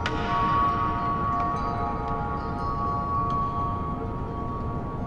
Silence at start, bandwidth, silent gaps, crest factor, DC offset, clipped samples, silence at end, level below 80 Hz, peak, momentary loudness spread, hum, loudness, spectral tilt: 0 s; 9 kHz; none; 14 dB; under 0.1%; under 0.1%; 0 s; -38 dBFS; -12 dBFS; 8 LU; none; -27 LUFS; -7.5 dB/octave